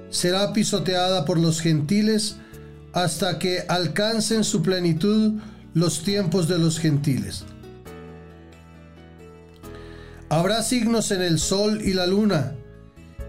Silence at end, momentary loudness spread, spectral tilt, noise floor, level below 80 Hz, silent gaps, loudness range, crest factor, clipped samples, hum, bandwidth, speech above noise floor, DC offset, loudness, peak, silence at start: 0 s; 20 LU; -5 dB/octave; -45 dBFS; -48 dBFS; none; 7 LU; 12 dB; under 0.1%; none; 16 kHz; 24 dB; under 0.1%; -22 LUFS; -10 dBFS; 0 s